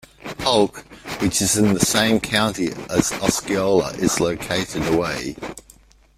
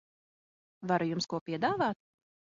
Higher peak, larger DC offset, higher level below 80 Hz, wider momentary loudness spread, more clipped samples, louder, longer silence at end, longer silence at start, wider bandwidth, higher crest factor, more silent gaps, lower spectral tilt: first, -2 dBFS vs -16 dBFS; neither; first, -46 dBFS vs -72 dBFS; about the same, 12 LU vs 10 LU; neither; first, -20 LUFS vs -32 LUFS; about the same, 0.55 s vs 0.5 s; second, 0.25 s vs 0.8 s; first, 16 kHz vs 7.4 kHz; about the same, 20 dB vs 18 dB; second, none vs 1.41-1.46 s; about the same, -3.5 dB/octave vs -4 dB/octave